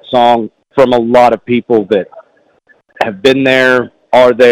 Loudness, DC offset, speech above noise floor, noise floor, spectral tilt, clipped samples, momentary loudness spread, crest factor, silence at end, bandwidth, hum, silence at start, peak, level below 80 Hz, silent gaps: -10 LUFS; under 0.1%; 42 dB; -50 dBFS; -5.5 dB/octave; 0.8%; 9 LU; 10 dB; 0 s; 14 kHz; none; 0.1 s; 0 dBFS; -48 dBFS; none